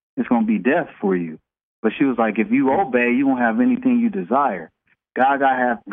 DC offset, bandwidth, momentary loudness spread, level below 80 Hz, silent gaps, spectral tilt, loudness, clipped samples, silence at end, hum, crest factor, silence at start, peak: under 0.1%; 3.7 kHz; 7 LU; -62 dBFS; 1.63-1.83 s; -9.5 dB/octave; -19 LUFS; under 0.1%; 0 s; none; 16 dB; 0.15 s; -4 dBFS